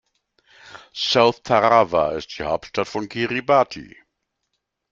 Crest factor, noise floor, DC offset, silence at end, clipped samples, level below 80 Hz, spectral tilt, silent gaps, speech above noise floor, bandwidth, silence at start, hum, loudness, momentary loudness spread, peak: 20 dB; -77 dBFS; under 0.1%; 1.05 s; under 0.1%; -56 dBFS; -4.5 dB/octave; none; 57 dB; 7.6 kHz; 0.75 s; none; -20 LUFS; 11 LU; -2 dBFS